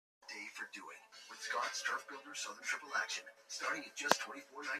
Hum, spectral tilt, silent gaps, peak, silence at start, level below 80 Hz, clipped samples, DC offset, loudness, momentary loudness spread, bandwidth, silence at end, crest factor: none; 0 dB/octave; none; -6 dBFS; 0.2 s; under -90 dBFS; under 0.1%; under 0.1%; -40 LUFS; 14 LU; 14 kHz; 0 s; 36 dB